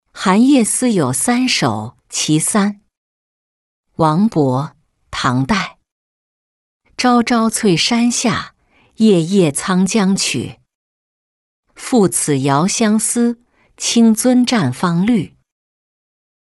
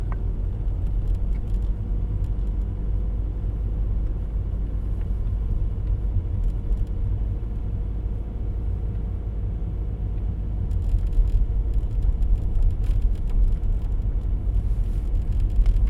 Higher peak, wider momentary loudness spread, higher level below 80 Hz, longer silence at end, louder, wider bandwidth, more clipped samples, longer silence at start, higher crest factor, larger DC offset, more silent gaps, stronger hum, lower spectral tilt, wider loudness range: first, -2 dBFS vs -8 dBFS; first, 11 LU vs 5 LU; second, -50 dBFS vs -24 dBFS; first, 1.15 s vs 0 s; first, -15 LUFS vs -28 LUFS; first, 12.5 kHz vs 3.1 kHz; neither; first, 0.15 s vs 0 s; about the same, 14 dB vs 14 dB; neither; first, 2.97-3.83 s, 5.92-6.80 s, 10.75-11.63 s vs none; neither; second, -4.5 dB/octave vs -9.5 dB/octave; about the same, 4 LU vs 3 LU